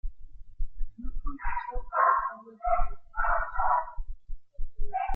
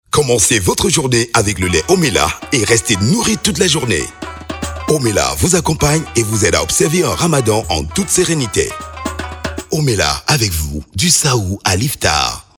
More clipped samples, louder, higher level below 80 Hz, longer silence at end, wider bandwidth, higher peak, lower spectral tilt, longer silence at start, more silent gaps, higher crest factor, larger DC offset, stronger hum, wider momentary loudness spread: neither; second, -30 LUFS vs -14 LUFS; about the same, -34 dBFS vs -32 dBFS; second, 0 s vs 0.15 s; second, 3 kHz vs over 20 kHz; second, -12 dBFS vs 0 dBFS; first, -8.5 dB/octave vs -3.5 dB/octave; about the same, 0.05 s vs 0.15 s; neither; about the same, 16 dB vs 14 dB; neither; neither; first, 21 LU vs 11 LU